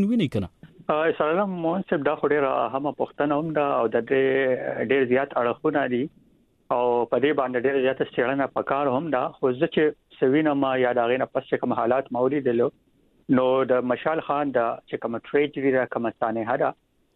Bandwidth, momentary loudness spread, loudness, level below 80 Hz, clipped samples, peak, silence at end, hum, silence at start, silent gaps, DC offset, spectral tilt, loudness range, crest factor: 4.3 kHz; 6 LU; -24 LUFS; -62 dBFS; under 0.1%; -8 dBFS; 0.45 s; none; 0 s; none; under 0.1%; -8.5 dB/octave; 1 LU; 16 dB